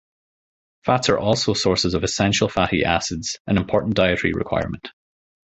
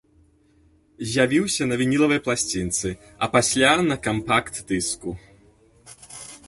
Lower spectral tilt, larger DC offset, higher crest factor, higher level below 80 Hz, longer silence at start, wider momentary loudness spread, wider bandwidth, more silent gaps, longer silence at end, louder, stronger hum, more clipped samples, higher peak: about the same, -4.5 dB/octave vs -3.5 dB/octave; neither; about the same, 20 dB vs 20 dB; first, -42 dBFS vs -50 dBFS; second, 0.85 s vs 1 s; second, 8 LU vs 17 LU; second, 8.4 kHz vs 12 kHz; first, 3.40-3.45 s vs none; first, 0.6 s vs 0.1 s; about the same, -20 LUFS vs -22 LUFS; neither; neither; about the same, -2 dBFS vs -4 dBFS